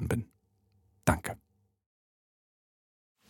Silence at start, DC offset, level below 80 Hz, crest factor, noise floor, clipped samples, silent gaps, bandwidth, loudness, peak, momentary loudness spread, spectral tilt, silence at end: 0 s; under 0.1%; -50 dBFS; 28 dB; -71 dBFS; under 0.1%; none; 17.5 kHz; -33 LUFS; -10 dBFS; 18 LU; -6 dB/octave; 1.95 s